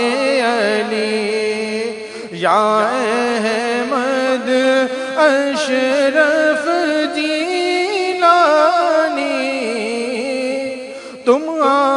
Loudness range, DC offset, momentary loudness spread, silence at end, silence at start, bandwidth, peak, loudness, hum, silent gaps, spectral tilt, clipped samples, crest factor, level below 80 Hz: 3 LU; under 0.1%; 7 LU; 0 s; 0 s; 11 kHz; 0 dBFS; -16 LUFS; none; none; -3.5 dB/octave; under 0.1%; 16 dB; -68 dBFS